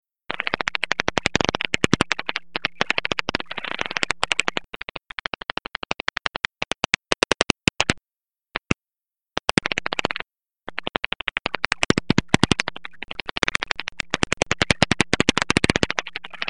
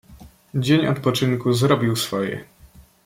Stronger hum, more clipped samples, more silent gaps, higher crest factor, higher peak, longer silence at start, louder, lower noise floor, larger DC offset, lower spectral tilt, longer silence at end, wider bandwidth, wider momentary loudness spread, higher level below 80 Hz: neither; neither; neither; first, 24 dB vs 18 dB; first, 0 dBFS vs -4 dBFS; about the same, 0.05 s vs 0.1 s; about the same, -23 LUFS vs -21 LUFS; first, under -90 dBFS vs -49 dBFS; first, 0.8% vs under 0.1%; second, -3.5 dB/octave vs -5.5 dB/octave; second, 0 s vs 0.25 s; second, 11.5 kHz vs 16.5 kHz; first, 13 LU vs 10 LU; first, -46 dBFS vs -54 dBFS